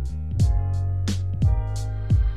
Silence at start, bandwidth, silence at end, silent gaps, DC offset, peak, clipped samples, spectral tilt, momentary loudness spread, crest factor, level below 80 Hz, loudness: 0 s; 10.5 kHz; 0 s; none; 2%; -10 dBFS; under 0.1%; -7 dB/octave; 6 LU; 12 dB; -26 dBFS; -25 LUFS